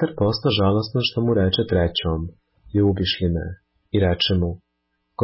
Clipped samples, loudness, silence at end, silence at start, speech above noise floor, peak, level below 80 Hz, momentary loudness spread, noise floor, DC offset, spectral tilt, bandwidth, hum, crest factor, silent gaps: under 0.1%; -21 LUFS; 0 s; 0 s; 53 dB; -8 dBFS; -34 dBFS; 9 LU; -73 dBFS; under 0.1%; -10 dB/octave; 5.8 kHz; none; 14 dB; none